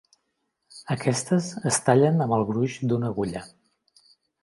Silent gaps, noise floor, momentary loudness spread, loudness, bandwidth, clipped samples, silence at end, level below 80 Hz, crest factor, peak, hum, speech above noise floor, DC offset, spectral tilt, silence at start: none; -77 dBFS; 12 LU; -24 LUFS; 11.5 kHz; under 0.1%; 0.95 s; -60 dBFS; 20 dB; -6 dBFS; none; 53 dB; under 0.1%; -5.5 dB/octave; 0.75 s